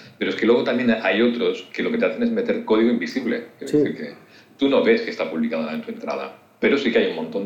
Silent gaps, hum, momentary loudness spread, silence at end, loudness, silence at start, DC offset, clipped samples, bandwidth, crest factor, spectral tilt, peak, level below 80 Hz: none; none; 10 LU; 0 s; -21 LUFS; 0 s; under 0.1%; under 0.1%; 9 kHz; 16 dB; -6 dB/octave; -6 dBFS; -64 dBFS